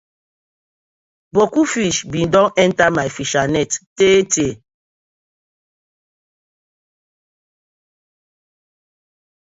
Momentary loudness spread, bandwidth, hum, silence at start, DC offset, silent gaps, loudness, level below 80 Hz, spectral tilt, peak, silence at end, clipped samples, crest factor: 7 LU; 8 kHz; none; 1.35 s; under 0.1%; 3.87-3.96 s; -16 LUFS; -50 dBFS; -4 dB/octave; 0 dBFS; 4.9 s; under 0.1%; 20 dB